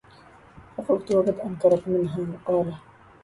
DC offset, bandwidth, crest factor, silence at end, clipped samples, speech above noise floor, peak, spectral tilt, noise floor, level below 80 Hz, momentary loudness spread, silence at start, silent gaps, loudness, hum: under 0.1%; 11.5 kHz; 18 dB; 0.45 s; under 0.1%; 28 dB; -8 dBFS; -8.5 dB/octave; -51 dBFS; -58 dBFS; 13 LU; 0.55 s; none; -24 LUFS; none